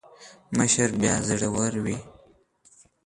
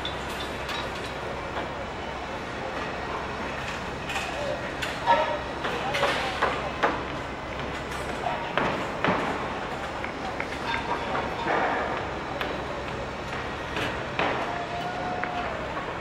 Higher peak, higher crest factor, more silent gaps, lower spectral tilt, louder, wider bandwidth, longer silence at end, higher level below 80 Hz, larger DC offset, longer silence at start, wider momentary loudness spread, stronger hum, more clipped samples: about the same, -6 dBFS vs -6 dBFS; about the same, 20 dB vs 24 dB; neither; about the same, -4 dB/octave vs -4.5 dB/octave; first, -24 LUFS vs -29 LUFS; second, 11.5 kHz vs 16 kHz; first, 0.95 s vs 0 s; second, -52 dBFS vs -46 dBFS; neither; first, 0.2 s vs 0 s; about the same, 9 LU vs 7 LU; neither; neither